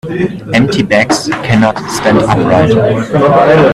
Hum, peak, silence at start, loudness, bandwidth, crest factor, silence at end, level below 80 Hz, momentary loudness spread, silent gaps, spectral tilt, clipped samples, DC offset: none; 0 dBFS; 0.05 s; -10 LUFS; 13.5 kHz; 10 dB; 0 s; -38 dBFS; 6 LU; none; -6 dB/octave; under 0.1%; under 0.1%